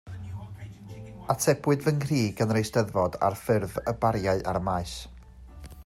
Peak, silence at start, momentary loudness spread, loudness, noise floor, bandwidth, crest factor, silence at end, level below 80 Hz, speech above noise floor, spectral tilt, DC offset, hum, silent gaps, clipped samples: -8 dBFS; 0.05 s; 18 LU; -27 LUFS; -47 dBFS; 16 kHz; 18 dB; 0 s; -48 dBFS; 20 dB; -6 dB/octave; under 0.1%; none; none; under 0.1%